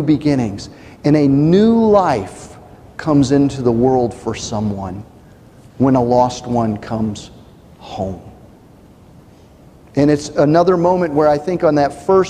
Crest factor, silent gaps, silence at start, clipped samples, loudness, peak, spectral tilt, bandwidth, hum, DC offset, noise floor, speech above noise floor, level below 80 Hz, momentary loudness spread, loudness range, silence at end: 14 dB; none; 0 s; under 0.1%; -15 LUFS; -2 dBFS; -7 dB/octave; 10.5 kHz; none; under 0.1%; -44 dBFS; 29 dB; -44 dBFS; 16 LU; 9 LU; 0 s